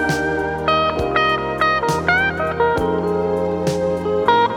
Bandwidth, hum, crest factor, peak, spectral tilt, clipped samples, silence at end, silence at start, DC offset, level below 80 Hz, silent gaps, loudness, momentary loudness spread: 18 kHz; none; 18 dB; 0 dBFS; -5 dB/octave; under 0.1%; 0 s; 0 s; under 0.1%; -40 dBFS; none; -18 LUFS; 4 LU